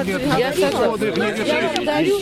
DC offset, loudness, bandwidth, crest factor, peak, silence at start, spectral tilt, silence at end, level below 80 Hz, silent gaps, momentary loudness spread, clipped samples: under 0.1%; -19 LUFS; 16 kHz; 18 dB; -2 dBFS; 0 s; -4.5 dB/octave; 0 s; -46 dBFS; none; 2 LU; under 0.1%